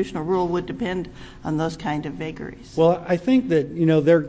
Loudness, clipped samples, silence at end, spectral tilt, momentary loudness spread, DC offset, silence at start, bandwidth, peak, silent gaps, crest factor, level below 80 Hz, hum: -22 LUFS; under 0.1%; 0 s; -7.5 dB/octave; 13 LU; under 0.1%; 0 s; 8 kHz; -6 dBFS; none; 16 dB; -48 dBFS; none